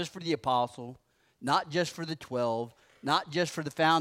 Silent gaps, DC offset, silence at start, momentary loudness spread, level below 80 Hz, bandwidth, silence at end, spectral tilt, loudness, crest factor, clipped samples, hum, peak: none; under 0.1%; 0 s; 11 LU; -70 dBFS; 16 kHz; 0 s; -4.5 dB/octave; -31 LUFS; 20 dB; under 0.1%; none; -12 dBFS